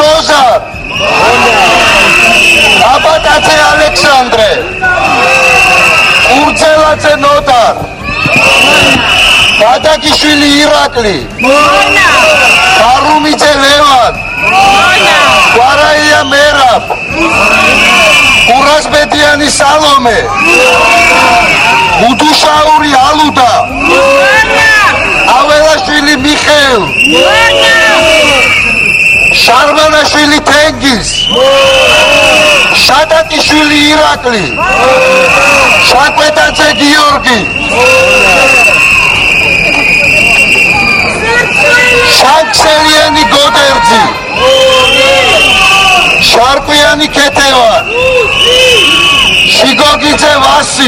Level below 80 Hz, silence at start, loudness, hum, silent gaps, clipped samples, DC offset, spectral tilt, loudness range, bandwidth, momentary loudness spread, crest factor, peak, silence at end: -28 dBFS; 0 s; -4 LUFS; none; none; 5%; under 0.1%; -2 dB/octave; 1 LU; over 20 kHz; 5 LU; 6 dB; 0 dBFS; 0 s